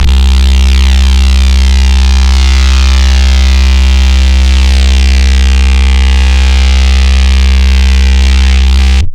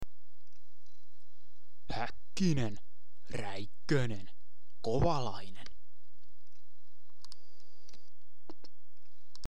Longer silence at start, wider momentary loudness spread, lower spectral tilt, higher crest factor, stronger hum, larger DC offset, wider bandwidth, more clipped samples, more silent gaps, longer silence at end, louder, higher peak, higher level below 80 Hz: about the same, 0 s vs 0 s; second, 0 LU vs 24 LU; second, -4.5 dB/octave vs -6 dB/octave; second, 4 dB vs 22 dB; neither; second, under 0.1% vs 4%; second, 9.8 kHz vs 16.5 kHz; neither; neither; about the same, 0 s vs 0 s; first, -7 LUFS vs -36 LUFS; first, 0 dBFS vs -16 dBFS; first, -4 dBFS vs -54 dBFS